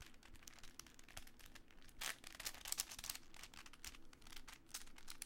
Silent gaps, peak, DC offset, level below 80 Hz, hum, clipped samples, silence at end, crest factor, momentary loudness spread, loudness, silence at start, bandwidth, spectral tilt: none; -18 dBFS; under 0.1%; -62 dBFS; none; under 0.1%; 0 s; 36 dB; 17 LU; -51 LUFS; 0 s; 17 kHz; 0 dB/octave